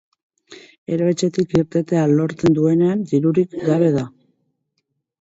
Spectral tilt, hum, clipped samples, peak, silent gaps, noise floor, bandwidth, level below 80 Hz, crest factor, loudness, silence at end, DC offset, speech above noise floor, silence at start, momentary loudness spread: -7.5 dB/octave; none; under 0.1%; -4 dBFS; 0.78-0.86 s; -74 dBFS; 8 kHz; -54 dBFS; 14 dB; -18 LUFS; 1.15 s; under 0.1%; 57 dB; 0.5 s; 6 LU